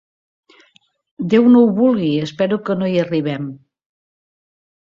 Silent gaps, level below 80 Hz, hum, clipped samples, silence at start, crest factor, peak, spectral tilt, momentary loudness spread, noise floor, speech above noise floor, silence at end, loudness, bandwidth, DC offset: none; -60 dBFS; none; under 0.1%; 1.2 s; 16 dB; -2 dBFS; -8 dB/octave; 14 LU; -57 dBFS; 41 dB; 1.4 s; -16 LUFS; 7 kHz; under 0.1%